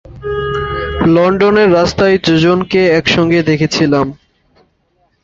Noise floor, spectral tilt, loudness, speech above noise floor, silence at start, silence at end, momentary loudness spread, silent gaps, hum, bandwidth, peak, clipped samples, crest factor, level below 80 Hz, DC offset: -59 dBFS; -6 dB/octave; -12 LUFS; 48 dB; 0.1 s; 1.1 s; 8 LU; none; none; 7.6 kHz; 0 dBFS; under 0.1%; 12 dB; -34 dBFS; under 0.1%